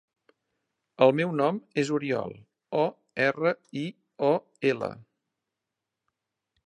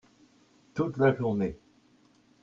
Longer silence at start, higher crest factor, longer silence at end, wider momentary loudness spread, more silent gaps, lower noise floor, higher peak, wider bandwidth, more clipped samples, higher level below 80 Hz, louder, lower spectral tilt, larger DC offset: first, 1 s vs 0.75 s; about the same, 24 dB vs 22 dB; first, 1.65 s vs 0.9 s; about the same, 13 LU vs 14 LU; neither; first, -86 dBFS vs -63 dBFS; first, -6 dBFS vs -10 dBFS; first, 10.5 kHz vs 7.6 kHz; neither; second, -74 dBFS vs -60 dBFS; about the same, -27 LUFS vs -29 LUFS; second, -6.5 dB/octave vs -8.5 dB/octave; neither